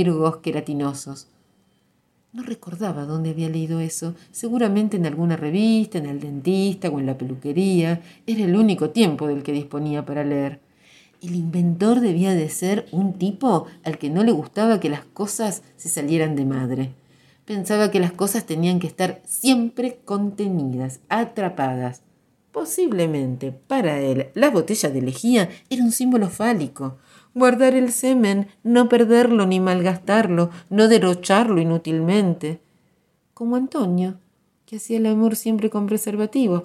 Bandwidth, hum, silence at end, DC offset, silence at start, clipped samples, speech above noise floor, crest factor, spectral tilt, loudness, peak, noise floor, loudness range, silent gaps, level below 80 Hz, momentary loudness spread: 15.5 kHz; none; 0 s; under 0.1%; 0 s; under 0.1%; 44 dB; 18 dB; -5.5 dB/octave; -21 LUFS; -2 dBFS; -64 dBFS; 7 LU; none; -66 dBFS; 11 LU